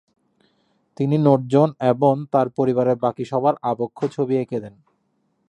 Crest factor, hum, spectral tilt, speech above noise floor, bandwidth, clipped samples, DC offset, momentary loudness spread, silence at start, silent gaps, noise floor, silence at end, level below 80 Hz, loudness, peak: 20 dB; none; -9 dB/octave; 49 dB; 10 kHz; under 0.1%; under 0.1%; 8 LU; 1 s; none; -68 dBFS; 0.8 s; -66 dBFS; -20 LUFS; -2 dBFS